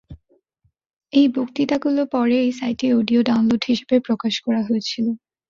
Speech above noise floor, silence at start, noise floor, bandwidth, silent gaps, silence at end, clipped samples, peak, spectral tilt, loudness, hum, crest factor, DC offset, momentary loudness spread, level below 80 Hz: 49 dB; 0.1 s; -67 dBFS; 7.4 kHz; 0.96-1.00 s; 0.35 s; under 0.1%; -4 dBFS; -5.5 dB/octave; -20 LUFS; none; 16 dB; under 0.1%; 5 LU; -58 dBFS